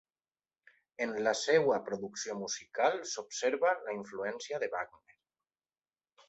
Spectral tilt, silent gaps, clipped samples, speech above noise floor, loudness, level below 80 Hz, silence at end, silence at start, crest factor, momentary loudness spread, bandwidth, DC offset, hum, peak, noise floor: -2.5 dB/octave; none; under 0.1%; over 57 dB; -33 LUFS; -80 dBFS; 1.4 s; 1 s; 22 dB; 11 LU; 8.2 kHz; under 0.1%; none; -14 dBFS; under -90 dBFS